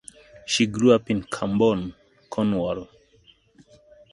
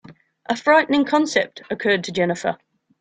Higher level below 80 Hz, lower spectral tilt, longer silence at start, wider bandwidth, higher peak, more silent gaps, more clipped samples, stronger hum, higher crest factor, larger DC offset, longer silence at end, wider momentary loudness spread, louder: first, -54 dBFS vs -64 dBFS; about the same, -5 dB/octave vs -4.5 dB/octave; first, 0.45 s vs 0.1 s; first, 11.5 kHz vs 9.4 kHz; about the same, -4 dBFS vs -2 dBFS; neither; neither; neither; about the same, 22 dB vs 18 dB; neither; first, 1.25 s vs 0.45 s; first, 15 LU vs 11 LU; second, -23 LUFS vs -20 LUFS